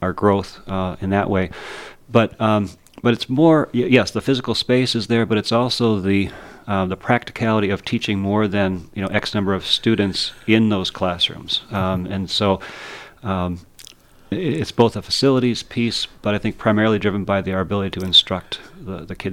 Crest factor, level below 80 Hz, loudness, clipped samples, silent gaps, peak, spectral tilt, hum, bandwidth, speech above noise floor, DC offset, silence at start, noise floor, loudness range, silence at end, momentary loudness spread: 20 dB; -48 dBFS; -19 LUFS; under 0.1%; none; 0 dBFS; -5.5 dB/octave; none; 15 kHz; 26 dB; under 0.1%; 0 s; -45 dBFS; 4 LU; 0 s; 11 LU